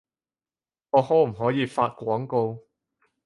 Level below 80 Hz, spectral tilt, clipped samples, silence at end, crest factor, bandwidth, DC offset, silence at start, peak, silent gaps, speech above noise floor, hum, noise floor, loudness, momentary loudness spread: -66 dBFS; -7.5 dB/octave; under 0.1%; 0.65 s; 20 dB; 11.5 kHz; under 0.1%; 0.95 s; -6 dBFS; none; over 67 dB; none; under -90 dBFS; -24 LUFS; 8 LU